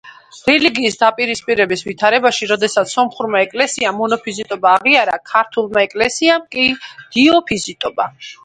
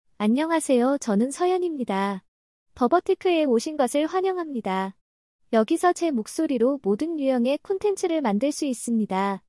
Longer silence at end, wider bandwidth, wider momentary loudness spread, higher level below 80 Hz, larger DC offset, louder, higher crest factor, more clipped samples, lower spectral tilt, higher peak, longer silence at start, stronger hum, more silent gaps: about the same, 0.1 s vs 0.1 s; about the same, 11 kHz vs 12 kHz; first, 8 LU vs 5 LU; first, -54 dBFS vs -66 dBFS; neither; first, -15 LUFS vs -24 LUFS; about the same, 16 dB vs 16 dB; neither; second, -3 dB/octave vs -5 dB/octave; first, 0 dBFS vs -8 dBFS; second, 0.05 s vs 0.2 s; neither; second, none vs 2.28-2.66 s, 5.01-5.39 s